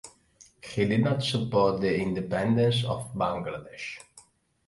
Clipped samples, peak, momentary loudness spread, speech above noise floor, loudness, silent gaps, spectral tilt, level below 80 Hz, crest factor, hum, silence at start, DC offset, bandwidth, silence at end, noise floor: under 0.1%; -10 dBFS; 14 LU; 32 dB; -27 LUFS; none; -6.5 dB/octave; -56 dBFS; 18 dB; none; 0.05 s; under 0.1%; 11.5 kHz; 0.5 s; -59 dBFS